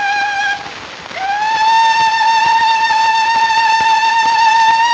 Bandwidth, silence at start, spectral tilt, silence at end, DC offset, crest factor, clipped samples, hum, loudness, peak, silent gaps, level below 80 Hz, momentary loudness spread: 8.6 kHz; 0 s; 0 dB/octave; 0 s; under 0.1%; 12 dB; under 0.1%; none; -12 LUFS; 0 dBFS; none; -54 dBFS; 10 LU